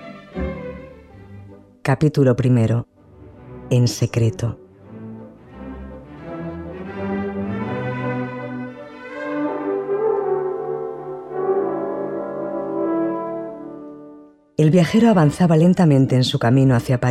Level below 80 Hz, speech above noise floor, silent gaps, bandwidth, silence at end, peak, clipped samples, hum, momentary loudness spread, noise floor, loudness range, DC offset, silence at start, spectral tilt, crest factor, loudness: -46 dBFS; 30 dB; none; 13.5 kHz; 0 s; -4 dBFS; under 0.1%; none; 22 LU; -45 dBFS; 11 LU; under 0.1%; 0 s; -7.5 dB/octave; 16 dB; -20 LUFS